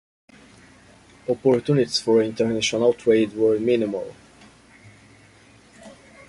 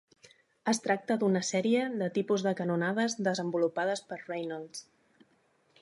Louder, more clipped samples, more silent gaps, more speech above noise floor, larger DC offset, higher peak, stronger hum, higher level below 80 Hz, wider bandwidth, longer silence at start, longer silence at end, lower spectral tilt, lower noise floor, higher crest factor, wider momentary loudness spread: first, -21 LUFS vs -31 LUFS; neither; neither; second, 31 dB vs 39 dB; neither; first, -6 dBFS vs -14 dBFS; neither; first, -60 dBFS vs -82 dBFS; about the same, 11.5 kHz vs 11.5 kHz; first, 1.3 s vs 0.65 s; second, 0.4 s vs 1 s; about the same, -5 dB/octave vs -5 dB/octave; second, -52 dBFS vs -70 dBFS; about the same, 18 dB vs 16 dB; about the same, 9 LU vs 10 LU